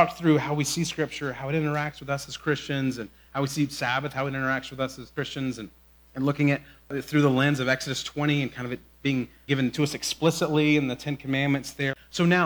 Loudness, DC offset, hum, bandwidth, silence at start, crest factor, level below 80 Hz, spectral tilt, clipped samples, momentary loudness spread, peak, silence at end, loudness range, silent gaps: -27 LUFS; under 0.1%; none; over 20 kHz; 0 s; 20 dB; -56 dBFS; -5 dB/octave; under 0.1%; 10 LU; -6 dBFS; 0 s; 3 LU; none